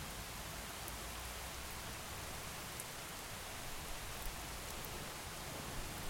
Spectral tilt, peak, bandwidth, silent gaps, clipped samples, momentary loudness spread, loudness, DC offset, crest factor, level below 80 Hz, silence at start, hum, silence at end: -2.5 dB/octave; -26 dBFS; 16.5 kHz; none; under 0.1%; 1 LU; -46 LUFS; under 0.1%; 20 dB; -54 dBFS; 0 s; none; 0 s